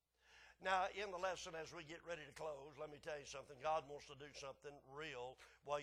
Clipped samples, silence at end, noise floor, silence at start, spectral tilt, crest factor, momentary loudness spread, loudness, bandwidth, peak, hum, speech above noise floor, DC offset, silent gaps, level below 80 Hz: under 0.1%; 0 s; -69 dBFS; 0.25 s; -3 dB/octave; 22 dB; 14 LU; -48 LUFS; 14 kHz; -26 dBFS; none; 21 dB; under 0.1%; none; -76 dBFS